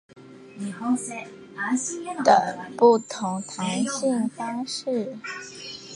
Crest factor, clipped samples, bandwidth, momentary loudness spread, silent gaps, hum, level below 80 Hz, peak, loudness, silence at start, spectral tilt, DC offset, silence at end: 22 dB; under 0.1%; 11.5 kHz; 17 LU; none; none; -74 dBFS; -4 dBFS; -25 LUFS; 0.15 s; -4 dB/octave; under 0.1%; 0 s